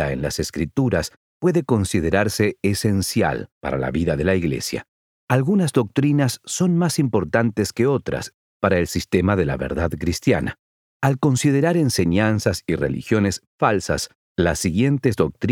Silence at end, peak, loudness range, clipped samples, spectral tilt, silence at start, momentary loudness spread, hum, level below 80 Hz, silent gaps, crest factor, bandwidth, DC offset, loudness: 0 s; -4 dBFS; 2 LU; under 0.1%; -5.5 dB/octave; 0 s; 6 LU; none; -42 dBFS; 1.16-1.40 s, 3.52-3.61 s, 4.88-5.28 s, 8.34-8.60 s, 10.59-11.00 s, 13.47-13.58 s, 14.15-14.35 s; 18 dB; 17.5 kHz; under 0.1%; -21 LUFS